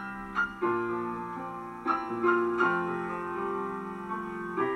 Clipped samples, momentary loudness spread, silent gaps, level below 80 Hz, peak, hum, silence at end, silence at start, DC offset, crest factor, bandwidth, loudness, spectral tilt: under 0.1%; 10 LU; none; -60 dBFS; -14 dBFS; none; 0 s; 0 s; under 0.1%; 18 dB; 10 kHz; -31 LUFS; -7 dB/octave